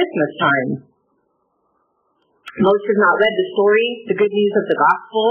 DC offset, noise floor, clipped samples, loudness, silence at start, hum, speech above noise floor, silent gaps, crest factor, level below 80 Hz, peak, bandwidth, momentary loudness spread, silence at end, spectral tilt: under 0.1%; -66 dBFS; under 0.1%; -16 LUFS; 0 s; none; 50 dB; none; 16 dB; -66 dBFS; -2 dBFS; 4.1 kHz; 6 LU; 0 s; -8 dB/octave